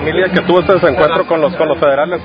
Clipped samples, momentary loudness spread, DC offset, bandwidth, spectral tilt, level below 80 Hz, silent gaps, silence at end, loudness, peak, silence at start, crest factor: 0.1%; 3 LU; under 0.1%; 5.2 kHz; -8.5 dB/octave; -38 dBFS; none; 0 s; -12 LUFS; 0 dBFS; 0 s; 12 dB